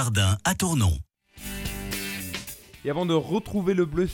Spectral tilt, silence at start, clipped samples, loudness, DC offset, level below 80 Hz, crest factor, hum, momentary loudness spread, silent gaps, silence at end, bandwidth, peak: -5 dB/octave; 0 s; under 0.1%; -26 LUFS; under 0.1%; -42 dBFS; 16 dB; none; 12 LU; none; 0 s; 17.5 kHz; -10 dBFS